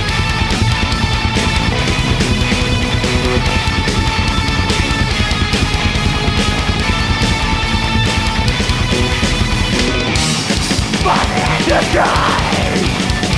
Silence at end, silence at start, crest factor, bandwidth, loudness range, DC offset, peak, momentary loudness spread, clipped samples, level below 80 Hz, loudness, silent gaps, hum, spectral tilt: 0 s; 0 s; 12 dB; 11 kHz; 1 LU; under 0.1%; -2 dBFS; 2 LU; under 0.1%; -22 dBFS; -14 LUFS; none; none; -4.5 dB/octave